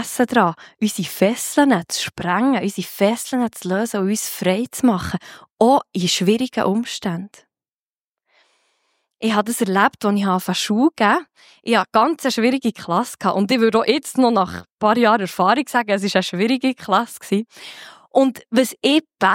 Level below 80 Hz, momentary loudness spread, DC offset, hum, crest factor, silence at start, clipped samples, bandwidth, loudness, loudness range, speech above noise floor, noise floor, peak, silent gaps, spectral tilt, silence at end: -58 dBFS; 8 LU; under 0.1%; none; 18 dB; 0 s; under 0.1%; 17 kHz; -19 LUFS; 4 LU; over 71 dB; under -90 dBFS; -2 dBFS; 5.50-5.57 s, 7.74-8.15 s, 14.72-14.78 s; -4.5 dB/octave; 0 s